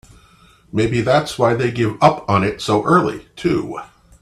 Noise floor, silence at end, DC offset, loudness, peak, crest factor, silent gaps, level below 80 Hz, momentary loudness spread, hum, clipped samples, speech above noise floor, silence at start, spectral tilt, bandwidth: -50 dBFS; 0.35 s; under 0.1%; -17 LUFS; 0 dBFS; 18 dB; none; -46 dBFS; 9 LU; none; under 0.1%; 33 dB; 0.75 s; -6.5 dB/octave; 13.5 kHz